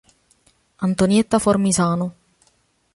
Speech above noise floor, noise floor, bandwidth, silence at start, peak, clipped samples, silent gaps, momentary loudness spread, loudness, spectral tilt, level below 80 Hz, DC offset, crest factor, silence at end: 45 dB; -63 dBFS; 11.5 kHz; 0.8 s; -2 dBFS; under 0.1%; none; 9 LU; -19 LUFS; -5.5 dB/octave; -50 dBFS; under 0.1%; 18 dB; 0.85 s